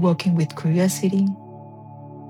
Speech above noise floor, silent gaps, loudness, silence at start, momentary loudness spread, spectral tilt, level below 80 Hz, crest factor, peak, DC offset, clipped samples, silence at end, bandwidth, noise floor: 20 dB; none; -21 LUFS; 0 s; 21 LU; -6.5 dB/octave; -72 dBFS; 14 dB; -8 dBFS; under 0.1%; under 0.1%; 0 s; 15.5 kHz; -40 dBFS